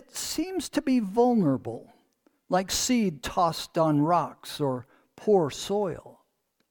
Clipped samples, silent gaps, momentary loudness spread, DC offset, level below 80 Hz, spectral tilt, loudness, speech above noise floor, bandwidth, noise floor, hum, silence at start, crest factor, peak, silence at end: under 0.1%; none; 10 LU; under 0.1%; -56 dBFS; -5 dB/octave; -26 LUFS; 47 dB; 19 kHz; -72 dBFS; none; 0.15 s; 16 dB; -10 dBFS; 0.6 s